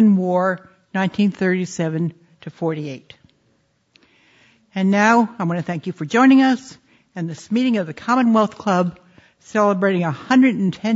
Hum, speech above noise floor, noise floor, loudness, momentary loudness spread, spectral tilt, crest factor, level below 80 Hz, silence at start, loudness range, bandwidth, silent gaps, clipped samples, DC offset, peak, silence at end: none; 45 dB; -63 dBFS; -19 LUFS; 15 LU; -6.5 dB/octave; 16 dB; -66 dBFS; 0 s; 7 LU; 8 kHz; none; under 0.1%; under 0.1%; -2 dBFS; 0 s